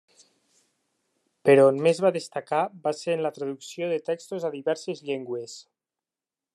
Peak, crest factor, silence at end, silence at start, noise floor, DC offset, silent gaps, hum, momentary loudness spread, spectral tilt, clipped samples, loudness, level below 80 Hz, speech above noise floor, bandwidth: -6 dBFS; 22 dB; 0.95 s; 1.45 s; under -90 dBFS; under 0.1%; none; none; 16 LU; -5.5 dB/octave; under 0.1%; -25 LUFS; -80 dBFS; over 65 dB; 12 kHz